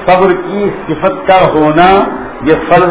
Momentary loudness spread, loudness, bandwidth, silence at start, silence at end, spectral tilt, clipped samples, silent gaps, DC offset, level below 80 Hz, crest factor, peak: 8 LU; -9 LUFS; 4 kHz; 0 s; 0 s; -10 dB/octave; 2%; none; under 0.1%; -34 dBFS; 8 dB; 0 dBFS